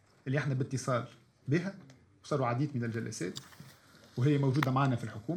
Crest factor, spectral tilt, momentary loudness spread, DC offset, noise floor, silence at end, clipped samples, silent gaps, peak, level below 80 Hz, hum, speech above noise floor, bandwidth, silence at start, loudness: 24 dB; -6.5 dB/octave; 18 LU; under 0.1%; -58 dBFS; 0 s; under 0.1%; none; -10 dBFS; -72 dBFS; none; 26 dB; 14 kHz; 0.25 s; -33 LUFS